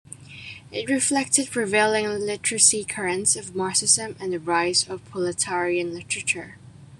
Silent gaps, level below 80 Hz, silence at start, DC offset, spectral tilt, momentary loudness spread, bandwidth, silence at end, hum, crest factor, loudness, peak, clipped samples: none; -64 dBFS; 0.1 s; under 0.1%; -1.5 dB/octave; 14 LU; 13 kHz; 0.05 s; none; 22 dB; -22 LUFS; -2 dBFS; under 0.1%